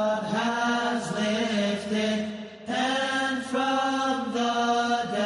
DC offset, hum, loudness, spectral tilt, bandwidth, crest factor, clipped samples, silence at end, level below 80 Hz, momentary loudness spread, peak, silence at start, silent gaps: under 0.1%; none; -26 LUFS; -4 dB/octave; 11.5 kHz; 12 dB; under 0.1%; 0 s; -70 dBFS; 3 LU; -14 dBFS; 0 s; none